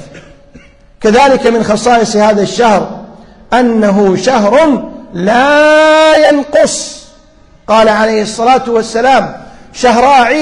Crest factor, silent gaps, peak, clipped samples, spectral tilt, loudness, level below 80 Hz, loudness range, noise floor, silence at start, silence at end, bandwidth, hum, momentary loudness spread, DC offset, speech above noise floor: 10 dB; none; 0 dBFS; 0.2%; -4 dB/octave; -8 LUFS; -38 dBFS; 3 LU; -41 dBFS; 0 s; 0 s; 11 kHz; none; 10 LU; under 0.1%; 34 dB